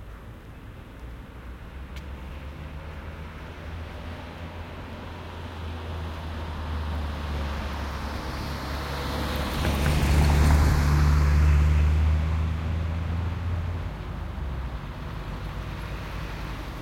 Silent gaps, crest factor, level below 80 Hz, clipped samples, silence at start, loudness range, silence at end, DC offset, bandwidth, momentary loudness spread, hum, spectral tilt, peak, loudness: none; 18 dB; -30 dBFS; under 0.1%; 0 s; 17 LU; 0 s; under 0.1%; 16 kHz; 19 LU; none; -6 dB/octave; -10 dBFS; -28 LUFS